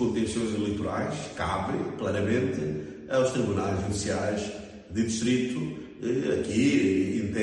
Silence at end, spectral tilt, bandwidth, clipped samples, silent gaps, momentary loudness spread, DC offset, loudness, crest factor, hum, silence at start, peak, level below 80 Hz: 0 s; -5.5 dB/octave; 11.5 kHz; under 0.1%; none; 9 LU; under 0.1%; -28 LUFS; 16 dB; none; 0 s; -12 dBFS; -52 dBFS